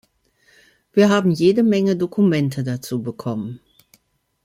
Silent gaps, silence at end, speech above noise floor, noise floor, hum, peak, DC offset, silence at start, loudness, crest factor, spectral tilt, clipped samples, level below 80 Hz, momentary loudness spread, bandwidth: none; 0.9 s; 45 dB; -63 dBFS; none; -4 dBFS; under 0.1%; 0.95 s; -19 LUFS; 16 dB; -7 dB/octave; under 0.1%; -60 dBFS; 11 LU; 15.5 kHz